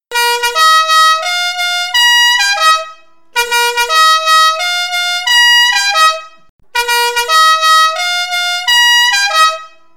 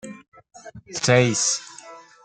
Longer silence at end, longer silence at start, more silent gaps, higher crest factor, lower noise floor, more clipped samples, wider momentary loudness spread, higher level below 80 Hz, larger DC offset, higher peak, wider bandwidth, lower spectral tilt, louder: about the same, 0.3 s vs 0.25 s; about the same, 0.1 s vs 0.05 s; about the same, 6.49-6.58 s vs 0.28-0.32 s; second, 12 dB vs 22 dB; second, -37 dBFS vs -44 dBFS; first, 0.5% vs under 0.1%; second, 8 LU vs 23 LU; first, -50 dBFS vs -62 dBFS; first, 0.5% vs under 0.1%; about the same, 0 dBFS vs -2 dBFS; first, 17.5 kHz vs 9.4 kHz; second, 4.5 dB/octave vs -3.5 dB/octave; first, -9 LUFS vs -20 LUFS